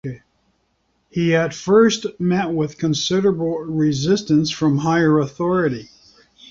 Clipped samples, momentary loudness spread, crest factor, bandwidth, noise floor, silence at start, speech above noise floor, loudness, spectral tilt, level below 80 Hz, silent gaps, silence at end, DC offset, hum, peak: under 0.1%; 8 LU; 16 dB; 7.6 kHz; -66 dBFS; 0.05 s; 48 dB; -19 LUFS; -5.5 dB/octave; -54 dBFS; none; 0.65 s; under 0.1%; none; -2 dBFS